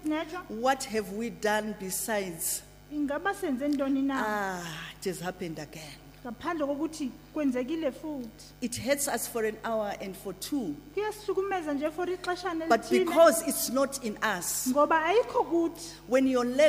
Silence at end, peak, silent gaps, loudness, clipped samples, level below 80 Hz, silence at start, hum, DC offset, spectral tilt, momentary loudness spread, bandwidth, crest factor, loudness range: 0 s; -8 dBFS; none; -29 LUFS; under 0.1%; -58 dBFS; 0 s; 50 Hz at -55 dBFS; under 0.1%; -3.5 dB/octave; 13 LU; 15.5 kHz; 20 dB; 8 LU